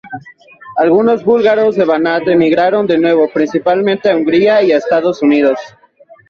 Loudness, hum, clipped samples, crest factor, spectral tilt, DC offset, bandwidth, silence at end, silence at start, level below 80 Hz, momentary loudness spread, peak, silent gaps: -12 LUFS; none; under 0.1%; 12 dB; -7 dB/octave; under 0.1%; 7 kHz; 0.6 s; 0.05 s; -56 dBFS; 5 LU; 0 dBFS; none